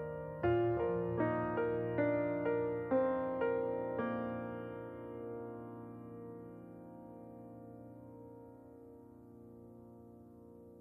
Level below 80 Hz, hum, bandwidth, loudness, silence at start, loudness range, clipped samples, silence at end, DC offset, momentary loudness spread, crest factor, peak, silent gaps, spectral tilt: -64 dBFS; none; 4.2 kHz; -37 LUFS; 0 s; 19 LU; under 0.1%; 0 s; under 0.1%; 22 LU; 18 dB; -22 dBFS; none; -10 dB/octave